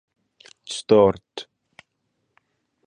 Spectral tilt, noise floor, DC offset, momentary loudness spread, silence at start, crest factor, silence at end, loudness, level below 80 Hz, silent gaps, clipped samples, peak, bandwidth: -5.5 dB/octave; -74 dBFS; under 0.1%; 26 LU; 0.7 s; 22 dB; 1.45 s; -20 LUFS; -56 dBFS; none; under 0.1%; -4 dBFS; 10 kHz